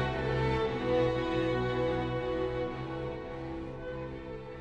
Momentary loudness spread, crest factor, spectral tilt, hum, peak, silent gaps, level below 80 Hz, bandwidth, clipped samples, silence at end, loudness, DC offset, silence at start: 11 LU; 16 dB; -7.5 dB/octave; none; -18 dBFS; none; -46 dBFS; 9 kHz; under 0.1%; 0 s; -33 LUFS; under 0.1%; 0 s